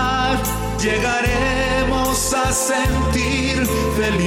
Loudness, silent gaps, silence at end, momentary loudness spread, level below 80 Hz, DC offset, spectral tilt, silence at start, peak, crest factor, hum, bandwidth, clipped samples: -18 LUFS; none; 0 s; 2 LU; -28 dBFS; under 0.1%; -4 dB/octave; 0 s; -8 dBFS; 10 dB; none; 16.5 kHz; under 0.1%